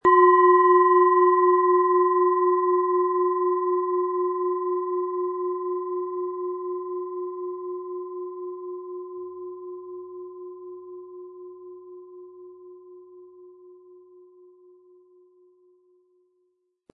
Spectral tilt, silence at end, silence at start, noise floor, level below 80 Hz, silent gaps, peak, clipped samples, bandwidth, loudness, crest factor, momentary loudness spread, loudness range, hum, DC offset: -8 dB/octave; 3.45 s; 0.05 s; -72 dBFS; -74 dBFS; none; -6 dBFS; under 0.1%; 3.2 kHz; -22 LUFS; 18 dB; 24 LU; 24 LU; none; under 0.1%